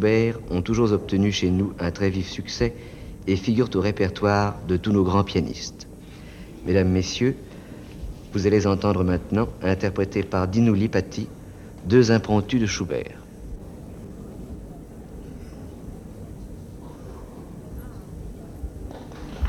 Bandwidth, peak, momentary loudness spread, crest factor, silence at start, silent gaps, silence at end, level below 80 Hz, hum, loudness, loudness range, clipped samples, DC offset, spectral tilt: 13 kHz; -4 dBFS; 20 LU; 20 dB; 0 s; none; 0 s; -42 dBFS; none; -23 LUFS; 17 LU; under 0.1%; under 0.1%; -6.5 dB/octave